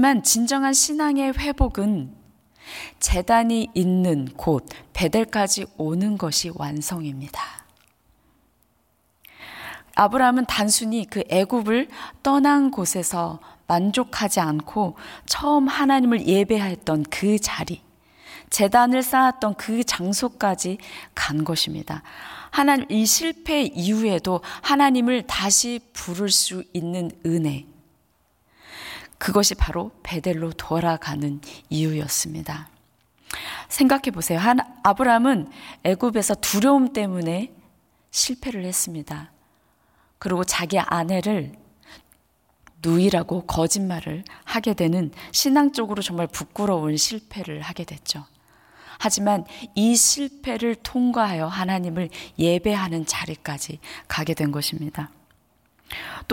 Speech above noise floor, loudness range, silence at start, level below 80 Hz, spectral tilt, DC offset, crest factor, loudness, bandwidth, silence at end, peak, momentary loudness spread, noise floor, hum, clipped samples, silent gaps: 43 dB; 6 LU; 0 s; -42 dBFS; -3.5 dB/octave; under 0.1%; 20 dB; -22 LUFS; 17 kHz; 0 s; -2 dBFS; 15 LU; -65 dBFS; none; under 0.1%; none